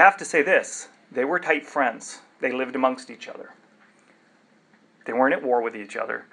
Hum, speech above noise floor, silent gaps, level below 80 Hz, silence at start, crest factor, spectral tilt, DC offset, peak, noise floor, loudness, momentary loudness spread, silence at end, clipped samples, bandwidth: none; 36 dB; none; -90 dBFS; 0 s; 24 dB; -3 dB/octave; under 0.1%; 0 dBFS; -59 dBFS; -24 LUFS; 19 LU; 0.1 s; under 0.1%; 11 kHz